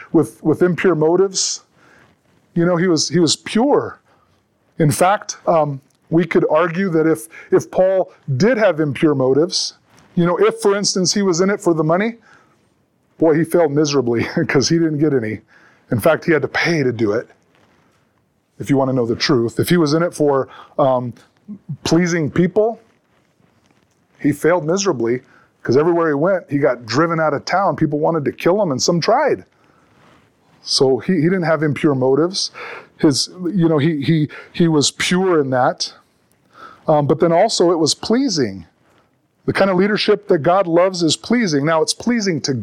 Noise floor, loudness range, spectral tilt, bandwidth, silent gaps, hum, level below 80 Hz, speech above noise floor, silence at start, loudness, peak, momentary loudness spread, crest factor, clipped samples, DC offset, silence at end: -62 dBFS; 3 LU; -5 dB/octave; 16.5 kHz; none; none; -54 dBFS; 46 dB; 0 s; -17 LUFS; -2 dBFS; 8 LU; 14 dB; under 0.1%; under 0.1%; 0 s